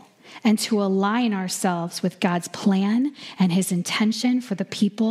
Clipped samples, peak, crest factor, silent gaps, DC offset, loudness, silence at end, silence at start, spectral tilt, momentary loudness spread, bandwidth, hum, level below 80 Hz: under 0.1%; -6 dBFS; 18 dB; none; under 0.1%; -23 LUFS; 0 s; 0.25 s; -5 dB/octave; 4 LU; 15 kHz; none; -74 dBFS